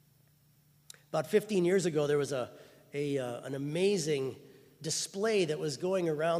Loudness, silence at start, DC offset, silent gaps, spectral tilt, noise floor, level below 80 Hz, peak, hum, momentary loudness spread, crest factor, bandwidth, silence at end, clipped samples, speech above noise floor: -32 LUFS; 1.15 s; under 0.1%; none; -4.5 dB/octave; -66 dBFS; -76 dBFS; -14 dBFS; none; 10 LU; 18 dB; 15.5 kHz; 0 s; under 0.1%; 35 dB